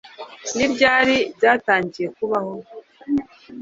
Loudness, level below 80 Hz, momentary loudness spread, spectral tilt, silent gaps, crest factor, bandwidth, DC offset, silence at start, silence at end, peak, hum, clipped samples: -19 LUFS; -58 dBFS; 20 LU; -3.5 dB/octave; none; 20 dB; 7.8 kHz; under 0.1%; 0.05 s; 0 s; 0 dBFS; none; under 0.1%